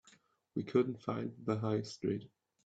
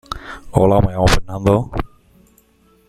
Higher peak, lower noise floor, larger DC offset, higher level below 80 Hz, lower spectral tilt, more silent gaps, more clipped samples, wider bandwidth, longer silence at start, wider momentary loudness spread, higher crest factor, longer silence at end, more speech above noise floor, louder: second, -16 dBFS vs -2 dBFS; first, -68 dBFS vs -54 dBFS; neither; second, -74 dBFS vs -28 dBFS; first, -7.5 dB/octave vs -6 dB/octave; neither; neither; second, 8 kHz vs 14 kHz; first, 0.55 s vs 0.1 s; second, 9 LU vs 16 LU; about the same, 20 dB vs 16 dB; second, 0.4 s vs 1 s; second, 32 dB vs 40 dB; second, -37 LUFS vs -17 LUFS